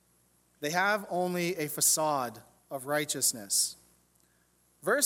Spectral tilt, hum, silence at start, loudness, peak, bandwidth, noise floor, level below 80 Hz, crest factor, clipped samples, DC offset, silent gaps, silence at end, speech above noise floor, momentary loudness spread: -2 dB/octave; 60 Hz at -60 dBFS; 0.6 s; -29 LUFS; -10 dBFS; 17.5 kHz; -69 dBFS; -76 dBFS; 22 dB; under 0.1%; under 0.1%; none; 0 s; 38 dB; 13 LU